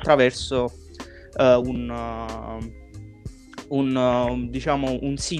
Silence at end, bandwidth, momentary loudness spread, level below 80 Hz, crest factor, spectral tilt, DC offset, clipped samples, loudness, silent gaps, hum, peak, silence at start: 0 s; 11 kHz; 22 LU; -40 dBFS; 22 dB; -5.5 dB/octave; under 0.1%; under 0.1%; -23 LUFS; none; none; -2 dBFS; 0 s